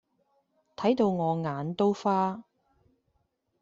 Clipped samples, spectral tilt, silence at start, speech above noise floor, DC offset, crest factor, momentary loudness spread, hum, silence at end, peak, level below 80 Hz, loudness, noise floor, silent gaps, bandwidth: under 0.1%; -7.5 dB/octave; 0.8 s; 49 dB; under 0.1%; 18 dB; 7 LU; none; 1.2 s; -12 dBFS; -70 dBFS; -28 LUFS; -75 dBFS; none; 7.6 kHz